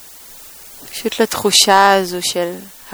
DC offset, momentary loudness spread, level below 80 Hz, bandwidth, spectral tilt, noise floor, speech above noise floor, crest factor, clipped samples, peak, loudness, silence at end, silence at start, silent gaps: under 0.1%; 25 LU; -54 dBFS; over 20 kHz; -1.5 dB/octave; -38 dBFS; 24 dB; 16 dB; under 0.1%; 0 dBFS; -14 LUFS; 0 s; 0 s; none